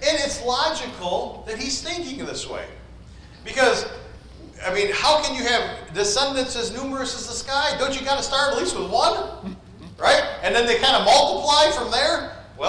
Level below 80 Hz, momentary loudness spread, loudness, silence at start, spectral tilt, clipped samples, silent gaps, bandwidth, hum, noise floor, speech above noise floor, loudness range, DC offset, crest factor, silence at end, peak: -44 dBFS; 15 LU; -21 LUFS; 0 s; -2 dB/octave; under 0.1%; none; 10.5 kHz; none; -43 dBFS; 21 dB; 8 LU; under 0.1%; 16 dB; 0 s; -6 dBFS